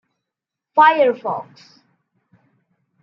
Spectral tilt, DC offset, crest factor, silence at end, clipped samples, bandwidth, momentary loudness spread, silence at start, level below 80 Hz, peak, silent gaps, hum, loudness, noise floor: -5.5 dB/octave; under 0.1%; 18 dB; 1.6 s; under 0.1%; 6 kHz; 14 LU; 0.75 s; -80 dBFS; -2 dBFS; none; none; -16 LUFS; -84 dBFS